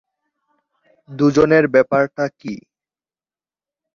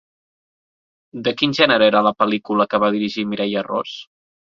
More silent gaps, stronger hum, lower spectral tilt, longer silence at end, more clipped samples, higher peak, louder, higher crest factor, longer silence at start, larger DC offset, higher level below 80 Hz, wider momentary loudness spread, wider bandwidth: neither; neither; first, -7 dB/octave vs -5.5 dB/octave; first, 1.35 s vs 0.55 s; neither; about the same, -2 dBFS vs 0 dBFS; about the same, -16 LUFS vs -18 LUFS; about the same, 18 dB vs 20 dB; about the same, 1.1 s vs 1.15 s; neither; first, -54 dBFS vs -62 dBFS; first, 19 LU vs 11 LU; about the same, 7.2 kHz vs 7.2 kHz